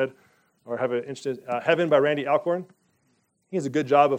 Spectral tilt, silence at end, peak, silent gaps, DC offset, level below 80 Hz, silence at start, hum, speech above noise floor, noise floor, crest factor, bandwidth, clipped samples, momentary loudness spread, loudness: -6 dB/octave; 0 s; -4 dBFS; none; under 0.1%; -78 dBFS; 0 s; none; 46 dB; -69 dBFS; 20 dB; 9.6 kHz; under 0.1%; 12 LU; -25 LUFS